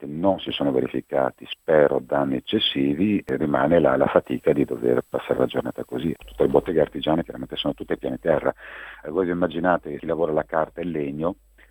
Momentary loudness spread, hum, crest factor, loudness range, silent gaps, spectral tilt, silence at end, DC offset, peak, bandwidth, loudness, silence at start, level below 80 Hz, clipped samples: 10 LU; none; 22 dB; 4 LU; none; -7.5 dB/octave; 0.4 s; under 0.1%; -2 dBFS; 18.5 kHz; -23 LUFS; 0 s; -50 dBFS; under 0.1%